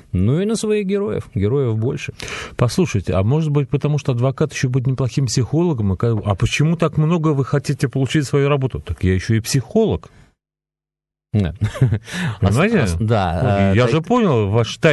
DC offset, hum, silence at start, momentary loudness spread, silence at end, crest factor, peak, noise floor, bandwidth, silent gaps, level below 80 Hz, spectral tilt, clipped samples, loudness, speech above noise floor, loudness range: under 0.1%; none; 0.15 s; 5 LU; 0 s; 16 dB; -2 dBFS; -89 dBFS; 12.5 kHz; none; -34 dBFS; -6.5 dB/octave; under 0.1%; -18 LUFS; 72 dB; 4 LU